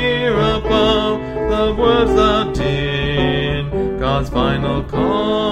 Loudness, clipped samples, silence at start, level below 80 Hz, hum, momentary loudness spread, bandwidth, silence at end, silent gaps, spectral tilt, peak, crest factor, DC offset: -17 LUFS; under 0.1%; 0 s; -28 dBFS; none; 6 LU; 10 kHz; 0 s; none; -6.5 dB/octave; -2 dBFS; 14 dB; under 0.1%